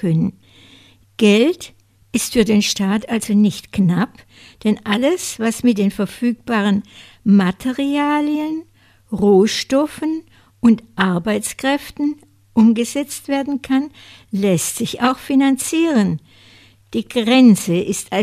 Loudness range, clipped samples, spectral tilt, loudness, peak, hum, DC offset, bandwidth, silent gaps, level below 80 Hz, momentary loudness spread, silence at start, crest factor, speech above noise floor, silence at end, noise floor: 2 LU; under 0.1%; -5 dB/octave; -17 LUFS; 0 dBFS; none; under 0.1%; 16 kHz; none; -50 dBFS; 10 LU; 0 s; 16 dB; 32 dB; 0 s; -48 dBFS